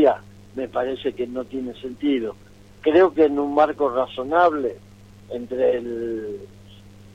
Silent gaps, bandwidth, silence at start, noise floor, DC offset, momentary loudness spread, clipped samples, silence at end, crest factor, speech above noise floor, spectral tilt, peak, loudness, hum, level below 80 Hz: none; 9.2 kHz; 0 s; -45 dBFS; under 0.1%; 15 LU; under 0.1%; 0.25 s; 18 dB; 24 dB; -7 dB/octave; -4 dBFS; -22 LUFS; none; -54 dBFS